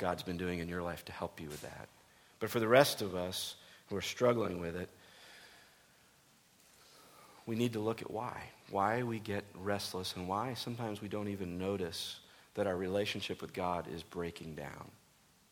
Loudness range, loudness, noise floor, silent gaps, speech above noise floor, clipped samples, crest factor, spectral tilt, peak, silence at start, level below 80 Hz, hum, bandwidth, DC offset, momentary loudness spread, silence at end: 8 LU; -37 LUFS; -67 dBFS; none; 31 dB; under 0.1%; 28 dB; -5 dB/octave; -10 dBFS; 0 s; -66 dBFS; none; over 20 kHz; under 0.1%; 19 LU; 0.6 s